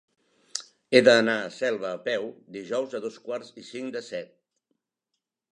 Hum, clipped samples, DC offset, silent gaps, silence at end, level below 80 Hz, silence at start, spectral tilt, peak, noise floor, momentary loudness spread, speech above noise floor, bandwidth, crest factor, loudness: none; under 0.1%; under 0.1%; none; 1.3 s; -80 dBFS; 0.55 s; -3.5 dB/octave; -2 dBFS; -84 dBFS; 18 LU; 58 dB; 11 kHz; 26 dB; -26 LUFS